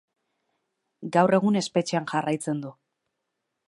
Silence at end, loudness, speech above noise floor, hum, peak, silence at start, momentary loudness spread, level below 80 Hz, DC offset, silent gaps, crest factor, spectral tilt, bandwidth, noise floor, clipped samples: 1 s; -25 LUFS; 57 dB; none; -6 dBFS; 1 s; 13 LU; -74 dBFS; under 0.1%; none; 22 dB; -5.5 dB/octave; 11.5 kHz; -81 dBFS; under 0.1%